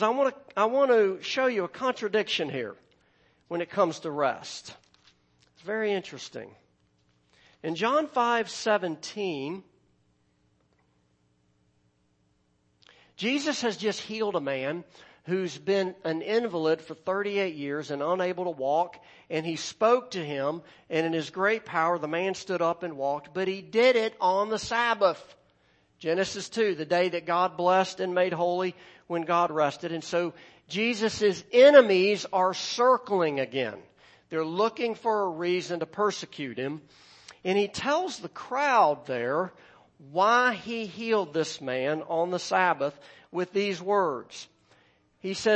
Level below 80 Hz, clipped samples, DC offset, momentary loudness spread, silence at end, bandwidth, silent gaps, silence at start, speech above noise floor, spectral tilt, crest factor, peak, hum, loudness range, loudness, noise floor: -72 dBFS; under 0.1%; under 0.1%; 12 LU; 0 s; 8.6 kHz; none; 0 s; 43 dB; -4.5 dB/octave; 22 dB; -4 dBFS; none; 9 LU; -27 LUFS; -70 dBFS